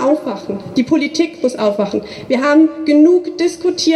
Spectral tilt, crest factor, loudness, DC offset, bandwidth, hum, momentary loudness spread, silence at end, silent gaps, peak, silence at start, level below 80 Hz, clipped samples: -4.5 dB/octave; 12 dB; -15 LUFS; under 0.1%; 11.5 kHz; none; 9 LU; 0 s; none; -2 dBFS; 0 s; -56 dBFS; under 0.1%